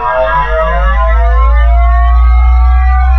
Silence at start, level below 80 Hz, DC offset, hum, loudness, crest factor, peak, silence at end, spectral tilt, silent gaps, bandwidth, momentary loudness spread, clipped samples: 0 s; -8 dBFS; under 0.1%; none; -10 LUFS; 8 dB; 0 dBFS; 0 s; -8 dB/octave; none; 4.1 kHz; 2 LU; under 0.1%